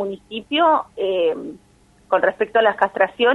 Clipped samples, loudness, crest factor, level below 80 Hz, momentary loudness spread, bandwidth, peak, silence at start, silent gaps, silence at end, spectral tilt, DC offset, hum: under 0.1%; -19 LUFS; 18 dB; -60 dBFS; 12 LU; 10 kHz; -2 dBFS; 0 s; none; 0 s; -5 dB/octave; under 0.1%; none